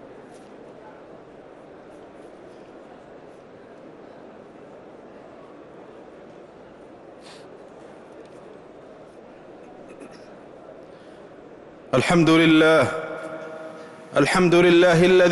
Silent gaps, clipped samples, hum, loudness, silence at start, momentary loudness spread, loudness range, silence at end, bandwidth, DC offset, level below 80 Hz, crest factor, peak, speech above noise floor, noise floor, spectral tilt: none; under 0.1%; none; -17 LUFS; 8.2 s; 29 LU; 25 LU; 0 s; 11.5 kHz; under 0.1%; -56 dBFS; 16 dB; -8 dBFS; 29 dB; -45 dBFS; -5.5 dB/octave